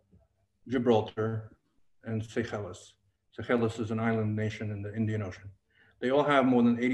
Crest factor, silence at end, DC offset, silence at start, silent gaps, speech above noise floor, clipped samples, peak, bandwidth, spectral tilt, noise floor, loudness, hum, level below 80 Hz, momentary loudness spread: 20 dB; 0 s; under 0.1%; 0.65 s; none; 39 dB; under 0.1%; -12 dBFS; 9.4 kHz; -7.5 dB/octave; -68 dBFS; -30 LUFS; none; -64 dBFS; 18 LU